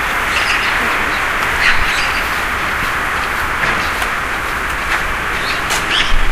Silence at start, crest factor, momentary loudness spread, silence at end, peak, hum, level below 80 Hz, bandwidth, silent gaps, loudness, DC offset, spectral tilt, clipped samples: 0 s; 16 dB; 4 LU; 0 s; 0 dBFS; none; -24 dBFS; 16 kHz; none; -15 LUFS; under 0.1%; -2 dB/octave; under 0.1%